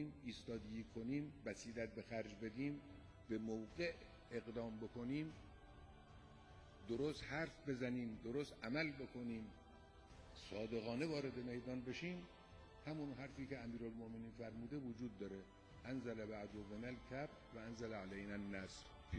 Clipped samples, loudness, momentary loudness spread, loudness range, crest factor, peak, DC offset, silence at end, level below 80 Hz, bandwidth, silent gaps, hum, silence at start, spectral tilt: under 0.1%; -49 LUFS; 17 LU; 4 LU; 20 dB; -28 dBFS; under 0.1%; 0 s; -66 dBFS; 10 kHz; none; none; 0 s; -6 dB/octave